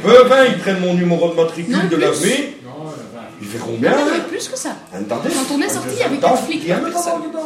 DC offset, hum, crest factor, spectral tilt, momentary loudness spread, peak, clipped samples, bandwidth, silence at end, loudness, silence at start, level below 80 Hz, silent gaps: under 0.1%; none; 16 dB; -4.5 dB/octave; 16 LU; 0 dBFS; under 0.1%; 15 kHz; 0 s; -16 LUFS; 0 s; -60 dBFS; none